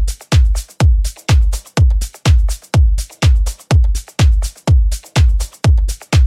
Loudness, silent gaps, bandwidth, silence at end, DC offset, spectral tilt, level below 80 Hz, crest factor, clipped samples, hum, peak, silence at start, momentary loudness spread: -15 LUFS; none; 14.5 kHz; 0 s; under 0.1%; -5.5 dB/octave; -14 dBFS; 10 dB; under 0.1%; none; -2 dBFS; 0 s; 3 LU